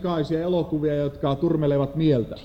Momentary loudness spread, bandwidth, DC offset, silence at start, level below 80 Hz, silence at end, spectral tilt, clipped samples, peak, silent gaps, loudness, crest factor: 3 LU; 8 kHz; under 0.1%; 0 s; -46 dBFS; 0 s; -9 dB/octave; under 0.1%; -10 dBFS; none; -23 LUFS; 14 dB